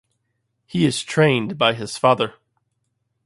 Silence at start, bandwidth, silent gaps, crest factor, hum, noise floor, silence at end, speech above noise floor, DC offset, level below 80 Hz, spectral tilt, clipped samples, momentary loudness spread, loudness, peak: 0.75 s; 11.5 kHz; none; 22 dB; none; -73 dBFS; 0.95 s; 54 dB; under 0.1%; -60 dBFS; -5 dB/octave; under 0.1%; 5 LU; -20 LUFS; 0 dBFS